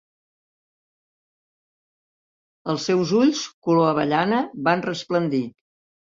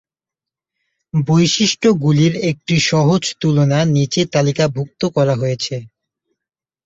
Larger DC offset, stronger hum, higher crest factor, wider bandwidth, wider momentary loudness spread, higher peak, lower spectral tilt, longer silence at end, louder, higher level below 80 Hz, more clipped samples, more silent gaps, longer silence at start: neither; neither; about the same, 20 dB vs 16 dB; about the same, 7.6 kHz vs 8 kHz; about the same, 8 LU vs 7 LU; about the same, -4 dBFS vs -2 dBFS; about the same, -5.5 dB/octave vs -5.5 dB/octave; second, 0.5 s vs 1 s; second, -22 LUFS vs -16 LUFS; second, -66 dBFS vs -52 dBFS; neither; first, 3.54-3.62 s vs none; first, 2.65 s vs 1.15 s